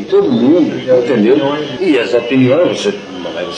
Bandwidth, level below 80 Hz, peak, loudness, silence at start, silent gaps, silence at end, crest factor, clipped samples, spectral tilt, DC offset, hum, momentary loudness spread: 9.8 kHz; -54 dBFS; 0 dBFS; -12 LUFS; 0 s; none; 0 s; 12 dB; under 0.1%; -6 dB/octave; under 0.1%; none; 8 LU